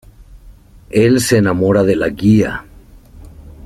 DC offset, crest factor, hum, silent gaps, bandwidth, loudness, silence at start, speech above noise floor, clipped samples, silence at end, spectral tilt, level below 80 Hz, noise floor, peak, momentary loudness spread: under 0.1%; 14 dB; none; none; 15 kHz; -13 LUFS; 0.35 s; 28 dB; under 0.1%; 0 s; -6 dB/octave; -38 dBFS; -41 dBFS; 0 dBFS; 7 LU